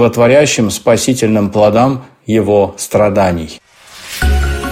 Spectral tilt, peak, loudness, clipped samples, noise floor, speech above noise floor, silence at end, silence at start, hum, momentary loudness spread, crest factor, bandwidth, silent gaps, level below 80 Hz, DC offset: -5 dB/octave; 0 dBFS; -12 LUFS; under 0.1%; -34 dBFS; 23 dB; 0 s; 0 s; none; 12 LU; 12 dB; 16.5 kHz; none; -24 dBFS; under 0.1%